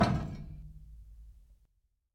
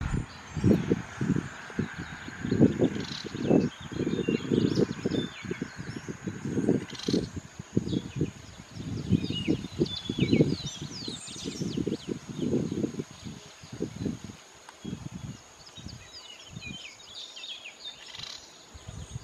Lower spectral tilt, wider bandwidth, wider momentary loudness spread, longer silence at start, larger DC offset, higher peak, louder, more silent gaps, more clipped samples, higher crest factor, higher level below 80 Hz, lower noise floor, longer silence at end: about the same, -7 dB/octave vs -6 dB/octave; about the same, 12.5 kHz vs 13.5 kHz; first, 23 LU vs 18 LU; about the same, 0 s vs 0 s; neither; second, -14 dBFS vs -6 dBFS; second, -37 LUFS vs -31 LUFS; neither; neither; about the same, 24 dB vs 24 dB; about the same, -48 dBFS vs -50 dBFS; first, -75 dBFS vs -50 dBFS; first, 0.6 s vs 0 s